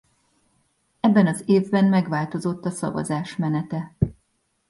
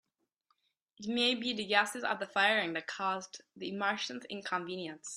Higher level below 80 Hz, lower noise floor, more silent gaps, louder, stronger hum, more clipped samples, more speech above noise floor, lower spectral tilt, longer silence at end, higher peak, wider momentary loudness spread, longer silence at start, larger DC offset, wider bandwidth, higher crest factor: first, -48 dBFS vs -82 dBFS; second, -70 dBFS vs -79 dBFS; neither; first, -23 LUFS vs -33 LUFS; neither; neither; first, 48 dB vs 44 dB; first, -7 dB/octave vs -2.5 dB/octave; first, 0.6 s vs 0 s; first, -4 dBFS vs -10 dBFS; second, 9 LU vs 13 LU; about the same, 1.05 s vs 1 s; neither; second, 11.5 kHz vs 13 kHz; second, 18 dB vs 24 dB